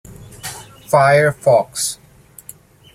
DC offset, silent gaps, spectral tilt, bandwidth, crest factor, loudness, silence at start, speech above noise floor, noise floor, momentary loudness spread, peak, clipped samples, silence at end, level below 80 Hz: under 0.1%; none; -4 dB/octave; 16 kHz; 18 dB; -15 LUFS; 0.1 s; 31 dB; -45 dBFS; 23 LU; 0 dBFS; under 0.1%; 1 s; -52 dBFS